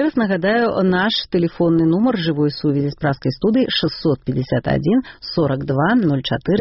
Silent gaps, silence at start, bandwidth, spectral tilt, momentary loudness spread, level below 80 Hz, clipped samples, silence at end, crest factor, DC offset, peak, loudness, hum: none; 0 s; 6 kHz; -5 dB/octave; 5 LU; -46 dBFS; under 0.1%; 0 s; 12 dB; under 0.1%; -6 dBFS; -18 LUFS; none